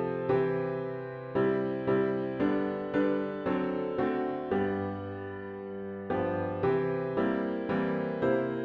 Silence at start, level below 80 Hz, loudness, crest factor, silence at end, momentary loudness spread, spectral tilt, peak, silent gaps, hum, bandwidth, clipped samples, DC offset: 0 s; -62 dBFS; -31 LUFS; 16 dB; 0 s; 10 LU; -9.5 dB/octave; -16 dBFS; none; none; 4.9 kHz; under 0.1%; under 0.1%